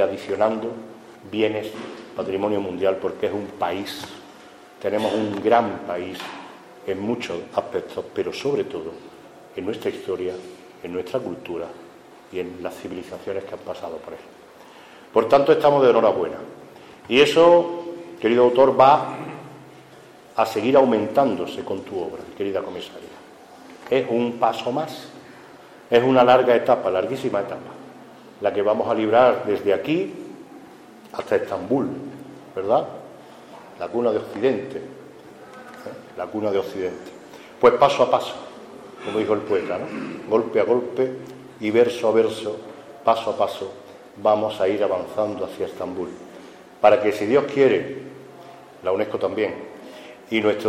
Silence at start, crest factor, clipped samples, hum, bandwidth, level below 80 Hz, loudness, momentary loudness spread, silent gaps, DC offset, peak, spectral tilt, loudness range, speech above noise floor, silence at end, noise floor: 0 s; 22 dB; under 0.1%; none; 15 kHz; -64 dBFS; -21 LUFS; 24 LU; none; under 0.1%; -2 dBFS; -5.5 dB/octave; 10 LU; 25 dB; 0 s; -46 dBFS